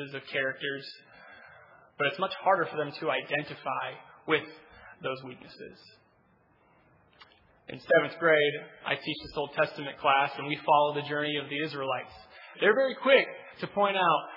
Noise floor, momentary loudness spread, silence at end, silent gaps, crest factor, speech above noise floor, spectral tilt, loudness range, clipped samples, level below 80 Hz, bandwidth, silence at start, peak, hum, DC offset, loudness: -65 dBFS; 21 LU; 0 s; none; 22 dB; 36 dB; -7 dB/octave; 10 LU; under 0.1%; -70 dBFS; 5.8 kHz; 0 s; -8 dBFS; none; under 0.1%; -28 LUFS